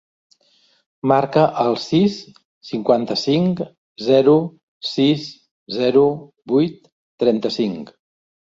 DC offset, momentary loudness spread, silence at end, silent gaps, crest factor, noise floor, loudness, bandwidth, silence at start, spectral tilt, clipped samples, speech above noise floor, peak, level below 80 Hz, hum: under 0.1%; 14 LU; 0.6 s; 2.45-2.61 s, 3.78-3.96 s, 4.63-4.81 s, 5.51-5.66 s, 6.92-7.18 s; 18 dB; -59 dBFS; -18 LUFS; 7.8 kHz; 1.05 s; -7 dB/octave; under 0.1%; 42 dB; -2 dBFS; -60 dBFS; none